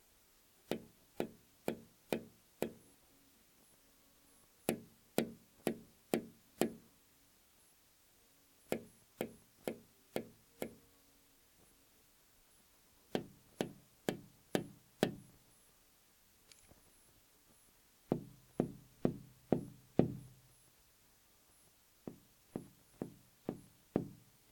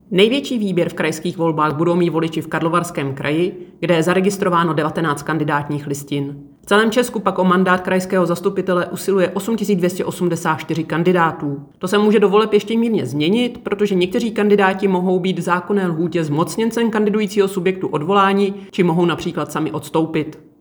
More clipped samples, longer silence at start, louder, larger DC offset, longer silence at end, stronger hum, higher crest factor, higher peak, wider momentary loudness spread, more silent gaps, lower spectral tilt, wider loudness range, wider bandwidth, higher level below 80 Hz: neither; first, 0.7 s vs 0.1 s; second, -44 LUFS vs -18 LUFS; neither; first, 0.35 s vs 0.2 s; neither; first, 34 dB vs 16 dB; second, -12 dBFS vs 0 dBFS; first, 26 LU vs 8 LU; neither; about the same, -5.5 dB/octave vs -6 dB/octave; first, 10 LU vs 2 LU; about the same, 19 kHz vs over 20 kHz; second, -72 dBFS vs -56 dBFS